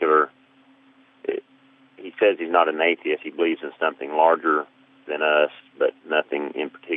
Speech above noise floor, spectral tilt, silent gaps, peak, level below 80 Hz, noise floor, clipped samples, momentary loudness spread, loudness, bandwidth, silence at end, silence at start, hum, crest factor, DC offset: 34 dB; -7 dB/octave; none; -4 dBFS; -88 dBFS; -56 dBFS; under 0.1%; 13 LU; -23 LUFS; 3.9 kHz; 0 s; 0 s; none; 20 dB; under 0.1%